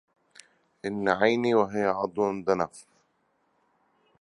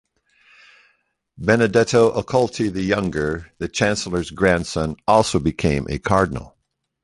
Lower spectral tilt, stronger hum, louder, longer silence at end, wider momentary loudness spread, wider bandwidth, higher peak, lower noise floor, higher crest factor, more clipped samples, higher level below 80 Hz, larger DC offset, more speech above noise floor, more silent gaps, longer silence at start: about the same, -6 dB/octave vs -5.5 dB/octave; neither; second, -26 LUFS vs -20 LUFS; first, 1.4 s vs 0.55 s; about the same, 10 LU vs 9 LU; about the same, 11.5 kHz vs 11.5 kHz; second, -6 dBFS vs -2 dBFS; about the same, -71 dBFS vs -72 dBFS; about the same, 22 dB vs 18 dB; neither; second, -66 dBFS vs -40 dBFS; neither; second, 46 dB vs 53 dB; neither; second, 0.85 s vs 1.4 s